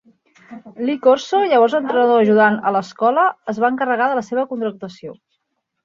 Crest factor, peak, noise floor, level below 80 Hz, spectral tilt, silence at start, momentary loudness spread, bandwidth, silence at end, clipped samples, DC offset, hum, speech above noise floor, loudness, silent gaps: 16 dB; -2 dBFS; -73 dBFS; -68 dBFS; -5.5 dB/octave; 0.5 s; 12 LU; 7.4 kHz; 0.7 s; under 0.1%; under 0.1%; none; 56 dB; -17 LUFS; none